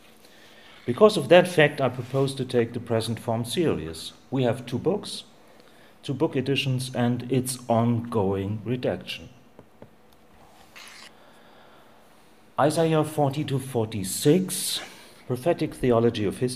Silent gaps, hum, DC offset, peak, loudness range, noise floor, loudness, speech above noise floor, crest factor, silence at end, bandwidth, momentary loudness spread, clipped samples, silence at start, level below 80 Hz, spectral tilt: none; none; 0.2%; -2 dBFS; 9 LU; -56 dBFS; -25 LUFS; 32 dB; 22 dB; 0 s; 15.5 kHz; 15 LU; under 0.1%; 0.85 s; -58 dBFS; -5.5 dB/octave